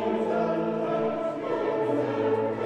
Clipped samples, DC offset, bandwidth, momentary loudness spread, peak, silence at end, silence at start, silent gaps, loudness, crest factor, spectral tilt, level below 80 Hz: under 0.1%; under 0.1%; 8.6 kHz; 3 LU; -14 dBFS; 0 s; 0 s; none; -27 LUFS; 12 dB; -8 dB/octave; -68 dBFS